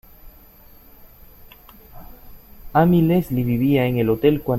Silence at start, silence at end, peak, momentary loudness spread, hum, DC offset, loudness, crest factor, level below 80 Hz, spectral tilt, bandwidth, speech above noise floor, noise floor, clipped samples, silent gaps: 0.25 s; 0 s; -4 dBFS; 5 LU; none; under 0.1%; -18 LUFS; 18 dB; -44 dBFS; -9 dB/octave; 16.5 kHz; 30 dB; -47 dBFS; under 0.1%; none